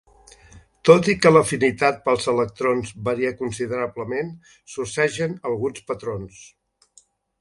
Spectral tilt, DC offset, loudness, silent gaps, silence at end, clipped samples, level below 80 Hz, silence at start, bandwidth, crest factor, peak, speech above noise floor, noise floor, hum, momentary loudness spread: -5 dB/octave; under 0.1%; -21 LUFS; none; 0.95 s; under 0.1%; -54 dBFS; 0.55 s; 11.5 kHz; 22 dB; 0 dBFS; 36 dB; -57 dBFS; none; 15 LU